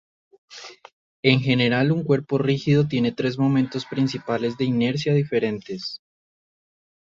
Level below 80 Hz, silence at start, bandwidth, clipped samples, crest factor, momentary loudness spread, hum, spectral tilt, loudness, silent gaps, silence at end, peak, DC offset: -60 dBFS; 0.5 s; 7.6 kHz; under 0.1%; 20 dB; 13 LU; none; -7 dB/octave; -22 LUFS; 0.93-1.23 s; 1.05 s; -4 dBFS; under 0.1%